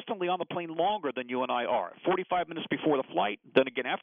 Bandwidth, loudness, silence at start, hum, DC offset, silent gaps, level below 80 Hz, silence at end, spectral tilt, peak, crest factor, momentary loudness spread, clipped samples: 4.6 kHz; -30 LUFS; 0 s; none; under 0.1%; none; -72 dBFS; 0.05 s; -2.5 dB/octave; -6 dBFS; 24 dB; 6 LU; under 0.1%